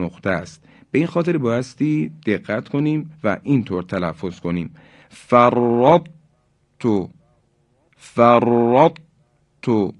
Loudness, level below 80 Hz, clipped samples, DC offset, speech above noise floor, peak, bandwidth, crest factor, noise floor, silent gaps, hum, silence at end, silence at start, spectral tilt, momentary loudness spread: -19 LUFS; -52 dBFS; under 0.1%; under 0.1%; 44 dB; 0 dBFS; 10.5 kHz; 20 dB; -62 dBFS; none; none; 0.05 s; 0 s; -8 dB/octave; 12 LU